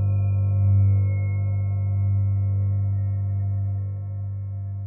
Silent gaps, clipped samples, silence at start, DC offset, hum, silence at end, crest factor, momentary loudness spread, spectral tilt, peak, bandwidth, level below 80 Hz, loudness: none; under 0.1%; 0 s; under 0.1%; 50 Hz at -40 dBFS; 0 s; 10 dB; 11 LU; -14.5 dB/octave; -12 dBFS; 2.6 kHz; -52 dBFS; -24 LUFS